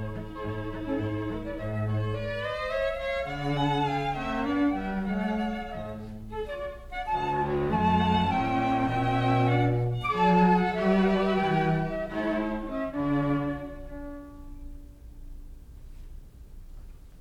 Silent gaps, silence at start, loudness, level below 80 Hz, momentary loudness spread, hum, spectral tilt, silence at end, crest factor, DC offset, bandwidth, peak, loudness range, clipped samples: none; 0 s; -28 LUFS; -44 dBFS; 14 LU; none; -8 dB/octave; 0 s; 18 dB; under 0.1%; 11.5 kHz; -10 dBFS; 9 LU; under 0.1%